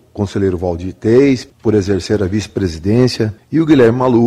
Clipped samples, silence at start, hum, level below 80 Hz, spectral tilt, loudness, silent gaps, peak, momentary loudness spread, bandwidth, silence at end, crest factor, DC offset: under 0.1%; 0.15 s; none; -40 dBFS; -7 dB/octave; -14 LUFS; none; -2 dBFS; 10 LU; 12 kHz; 0 s; 12 dB; under 0.1%